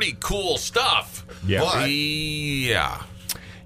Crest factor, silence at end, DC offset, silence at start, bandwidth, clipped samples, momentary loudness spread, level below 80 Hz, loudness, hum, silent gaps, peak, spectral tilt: 20 dB; 0 s; under 0.1%; 0 s; 15.5 kHz; under 0.1%; 11 LU; -42 dBFS; -23 LUFS; none; none; -4 dBFS; -3.5 dB/octave